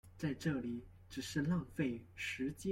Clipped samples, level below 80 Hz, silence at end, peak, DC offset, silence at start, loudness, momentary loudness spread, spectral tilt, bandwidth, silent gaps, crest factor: under 0.1%; -64 dBFS; 0 s; -24 dBFS; under 0.1%; 0.05 s; -41 LUFS; 9 LU; -6 dB/octave; 16.5 kHz; none; 16 dB